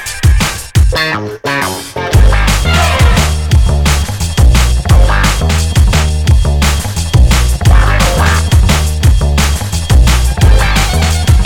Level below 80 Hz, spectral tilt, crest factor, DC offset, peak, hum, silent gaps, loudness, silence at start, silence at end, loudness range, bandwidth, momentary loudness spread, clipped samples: -10 dBFS; -4.5 dB/octave; 8 dB; under 0.1%; 0 dBFS; none; none; -10 LUFS; 0 s; 0 s; 1 LU; 17.5 kHz; 5 LU; 0.5%